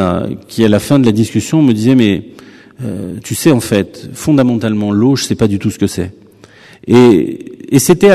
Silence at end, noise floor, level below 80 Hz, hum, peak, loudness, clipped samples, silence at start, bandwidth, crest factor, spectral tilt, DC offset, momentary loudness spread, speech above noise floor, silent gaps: 0 s; -40 dBFS; -44 dBFS; none; 0 dBFS; -12 LUFS; 0.6%; 0 s; 14 kHz; 12 dB; -6 dB/octave; under 0.1%; 14 LU; 29 dB; none